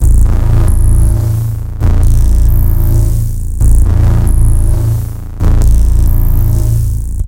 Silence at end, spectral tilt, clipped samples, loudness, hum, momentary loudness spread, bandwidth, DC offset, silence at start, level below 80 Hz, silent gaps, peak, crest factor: 0 s; -7.5 dB/octave; under 0.1%; -12 LUFS; none; 5 LU; 16.5 kHz; 0.2%; 0 s; -8 dBFS; none; 0 dBFS; 8 dB